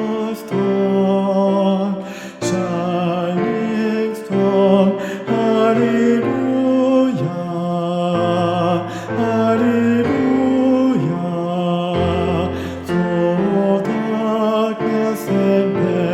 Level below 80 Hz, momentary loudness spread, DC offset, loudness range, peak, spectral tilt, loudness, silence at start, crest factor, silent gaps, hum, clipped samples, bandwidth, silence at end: -54 dBFS; 7 LU; under 0.1%; 2 LU; 0 dBFS; -7.5 dB/octave; -17 LUFS; 0 s; 16 dB; none; none; under 0.1%; 15.5 kHz; 0 s